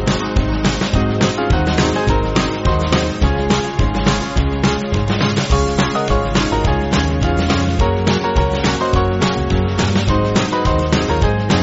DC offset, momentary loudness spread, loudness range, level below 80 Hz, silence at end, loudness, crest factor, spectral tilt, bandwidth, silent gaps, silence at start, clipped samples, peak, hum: 0.1%; 2 LU; 1 LU; -22 dBFS; 0 s; -16 LUFS; 14 dB; -5 dB/octave; 8 kHz; none; 0 s; under 0.1%; -2 dBFS; none